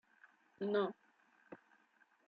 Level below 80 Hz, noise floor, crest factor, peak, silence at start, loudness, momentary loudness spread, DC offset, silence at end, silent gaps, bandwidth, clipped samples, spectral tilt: under -90 dBFS; -73 dBFS; 20 dB; -24 dBFS; 0.6 s; -40 LUFS; 22 LU; under 0.1%; 0.7 s; none; 5 kHz; under 0.1%; -4.5 dB/octave